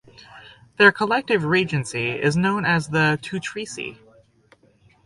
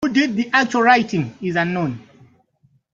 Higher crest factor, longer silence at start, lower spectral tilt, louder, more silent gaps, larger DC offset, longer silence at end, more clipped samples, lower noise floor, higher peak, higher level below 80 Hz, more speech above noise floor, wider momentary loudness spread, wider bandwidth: about the same, 22 dB vs 18 dB; first, 0.35 s vs 0 s; about the same, -5 dB/octave vs -5.5 dB/octave; about the same, -20 LUFS vs -18 LUFS; neither; neither; first, 1.1 s vs 0.95 s; neither; second, -57 dBFS vs -61 dBFS; about the same, -2 dBFS vs -2 dBFS; about the same, -56 dBFS vs -60 dBFS; second, 36 dB vs 42 dB; first, 14 LU vs 10 LU; first, 11.5 kHz vs 7.8 kHz